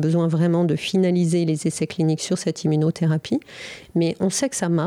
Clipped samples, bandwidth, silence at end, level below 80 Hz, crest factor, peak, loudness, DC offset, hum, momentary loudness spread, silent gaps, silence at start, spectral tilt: under 0.1%; 13 kHz; 0 s; -62 dBFS; 10 dB; -10 dBFS; -22 LUFS; under 0.1%; none; 7 LU; none; 0 s; -6 dB/octave